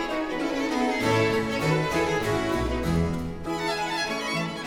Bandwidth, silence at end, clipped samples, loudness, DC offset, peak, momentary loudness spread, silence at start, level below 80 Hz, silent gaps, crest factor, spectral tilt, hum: 18 kHz; 0 s; under 0.1%; -26 LUFS; under 0.1%; -10 dBFS; 5 LU; 0 s; -42 dBFS; none; 16 dB; -5 dB/octave; none